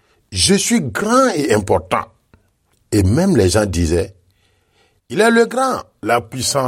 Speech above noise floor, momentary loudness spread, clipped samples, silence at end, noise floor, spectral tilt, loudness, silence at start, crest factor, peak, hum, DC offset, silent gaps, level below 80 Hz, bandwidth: 46 dB; 9 LU; under 0.1%; 0 s; -61 dBFS; -4.5 dB/octave; -16 LUFS; 0.3 s; 16 dB; -2 dBFS; none; under 0.1%; none; -38 dBFS; 16.5 kHz